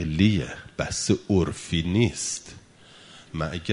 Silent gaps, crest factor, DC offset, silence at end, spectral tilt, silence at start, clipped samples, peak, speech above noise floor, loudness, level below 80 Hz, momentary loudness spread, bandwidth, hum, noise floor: none; 18 dB; under 0.1%; 0 s; -5 dB/octave; 0 s; under 0.1%; -6 dBFS; 26 dB; -25 LUFS; -40 dBFS; 12 LU; 11 kHz; none; -51 dBFS